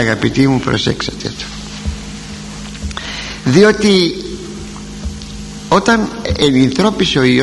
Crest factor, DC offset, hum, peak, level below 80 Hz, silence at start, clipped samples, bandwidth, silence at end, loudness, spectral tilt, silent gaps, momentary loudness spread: 14 dB; 0.1%; none; 0 dBFS; -32 dBFS; 0 s; under 0.1%; 12 kHz; 0 s; -14 LUFS; -5 dB/octave; none; 17 LU